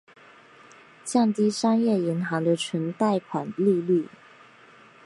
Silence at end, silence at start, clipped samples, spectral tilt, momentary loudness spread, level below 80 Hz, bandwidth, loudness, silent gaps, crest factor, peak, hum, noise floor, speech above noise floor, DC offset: 1 s; 1.05 s; under 0.1%; -6 dB/octave; 7 LU; -76 dBFS; 11.5 kHz; -24 LUFS; none; 16 dB; -10 dBFS; none; -52 dBFS; 29 dB; under 0.1%